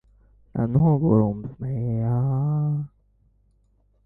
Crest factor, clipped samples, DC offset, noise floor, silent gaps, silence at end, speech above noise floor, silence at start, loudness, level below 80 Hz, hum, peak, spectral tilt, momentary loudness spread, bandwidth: 18 dB; under 0.1%; under 0.1%; -63 dBFS; none; 1.2 s; 41 dB; 0.55 s; -23 LUFS; -48 dBFS; 50 Hz at -50 dBFS; -6 dBFS; -13.5 dB/octave; 12 LU; 2.3 kHz